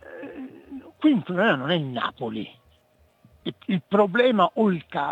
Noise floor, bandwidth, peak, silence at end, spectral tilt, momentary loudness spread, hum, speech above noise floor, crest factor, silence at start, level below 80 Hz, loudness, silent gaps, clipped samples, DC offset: -61 dBFS; 8 kHz; -6 dBFS; 0 s; -8 dB/octave; 20 LU; none; 39 dB; 18 dB; 0.05 s; -68 dBFS; -23 LUFS; none; under 0.1%; under 0.1%